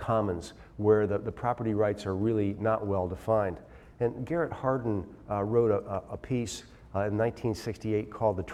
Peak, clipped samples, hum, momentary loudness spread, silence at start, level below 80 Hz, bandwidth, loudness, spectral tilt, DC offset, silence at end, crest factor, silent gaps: -12 dBFS; under 0.1%; none; 10 LU; 0 s; -54 dBFS; 13.5 kHz; -30 LUFS; -7.5 dB/octave; under 0.1%; 0 s; 18 dB; none